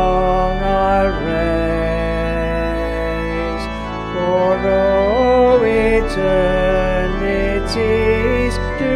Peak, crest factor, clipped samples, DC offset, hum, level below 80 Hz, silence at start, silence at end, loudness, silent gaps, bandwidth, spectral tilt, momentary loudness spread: -2 dBFS; 12 dB; under 0.1%; under 0.1%; none; -24 dBFS; 0 s; 0 s; -17 LUFS; none; 13 kHz; -6.5 dB/octave; 7 LU